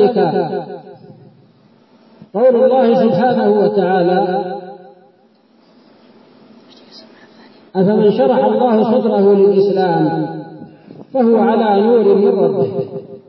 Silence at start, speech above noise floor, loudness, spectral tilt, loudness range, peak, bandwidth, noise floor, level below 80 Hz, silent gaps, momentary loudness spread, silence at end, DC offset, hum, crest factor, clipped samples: 0 s; 39 dB; -13 LUFS; -10 dB/octave; 8 LU; -2 dBFS; 5.8 kHz; -51 dBFS; -68 dBFS; none; 14 LU; 0.1 s; under 0.1%; none; 14 dB; under 0.1%